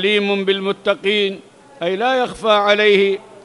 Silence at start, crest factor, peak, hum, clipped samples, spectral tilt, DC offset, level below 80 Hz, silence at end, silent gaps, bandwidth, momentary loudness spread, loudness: 0 s; 16 dB; -2 dBFS; none; under 0.1%; -4.5 dB/octave; under 0.1%; -58 dBFS; 0.25 s; none; 11.5 kHz; 10 LU; -16 LUFS